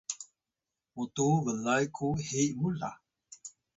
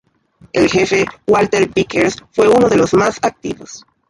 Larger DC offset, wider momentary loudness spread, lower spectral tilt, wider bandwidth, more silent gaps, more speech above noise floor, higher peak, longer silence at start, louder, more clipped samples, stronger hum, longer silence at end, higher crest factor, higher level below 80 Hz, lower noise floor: neither; first, 19 LU vs 13 LU; about the same, -5 dB/octave vs -5 dB/octave; second, 8 kHz vs 11.5 kHz; neither; first, 59 dB vs 35 dB; second, -16 dBFS vs -2 dBFS; second, 0.1 s vs 0.55 s; second, -32 LUFS vs -14 LUFS; neither; neither; about the same, 0.25 s vs 0.3 s; about the same, 18 dB vs 14 dB; second, -62 dBFS vs -46 dBFS; first, -90 dBFS vs -49 dBFS